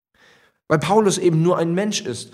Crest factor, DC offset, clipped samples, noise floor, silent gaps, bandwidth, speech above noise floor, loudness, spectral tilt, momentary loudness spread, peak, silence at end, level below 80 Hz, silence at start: 18 dB; under 0.1%; under 0.1%; -55 dBFS; none; 14 kHz; 37 dB; -19 LUFS; -5.5 dB/octave; 6 LU; -2 dBFS; 0.05 s; -60 dBFS; 0.7 s